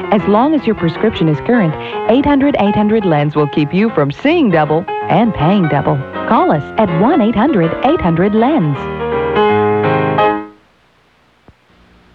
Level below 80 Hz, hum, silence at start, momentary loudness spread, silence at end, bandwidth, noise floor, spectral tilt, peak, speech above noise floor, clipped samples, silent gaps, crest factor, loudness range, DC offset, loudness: -40 dBFS; none; 0 s; 4 LU; 1.65 s; 6 kHz; -52 dBFS; -9.5 dB/octave; 0 dBFS; 40 dB; under 0.1%; none; 12 dB; 2 LU; under 0.1%; -13 LUFS